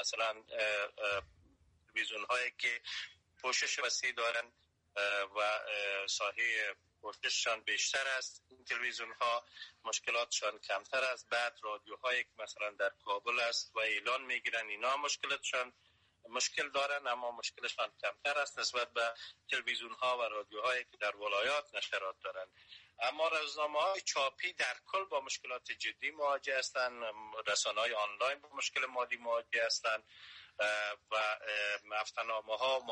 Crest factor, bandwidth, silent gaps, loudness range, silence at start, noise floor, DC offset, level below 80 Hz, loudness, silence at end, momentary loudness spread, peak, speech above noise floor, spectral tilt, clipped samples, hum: 14 dB; 10 kHz; none; 2 LU; 0 s; -69 dBFS; under 0.1%; -80 dBFS; -36 LUFS; 0 s; 8 LU; -22 dBFS; 32 dB; 1 dB/octave; under 0.1%; none